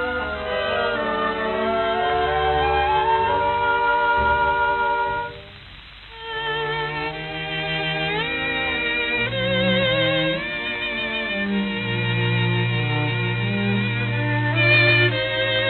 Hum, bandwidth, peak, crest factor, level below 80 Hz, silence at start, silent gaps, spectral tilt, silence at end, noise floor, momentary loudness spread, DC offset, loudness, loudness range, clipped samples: none; 4.5 kHz; -6 dBFS; 16 dB; -42 dBFS; 0 s; none; -8.5 dB/octave; 0 s; -41 dBFS; 7 LU; under 0.1%; -21 LUFS; 5 LU; under 0.1%